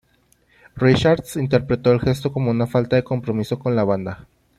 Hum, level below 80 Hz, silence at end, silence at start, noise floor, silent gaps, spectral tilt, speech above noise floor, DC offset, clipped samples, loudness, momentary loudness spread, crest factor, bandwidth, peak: none; -46 dBFS; 0.4 s; 0.75 s; -60 dBFS; none; -7 dB/octave; 41 dB; under 0.1%; under 0.1%; -20 LUFS; 7 LU; 18 dB; 14.5 kHz; -2 dBFS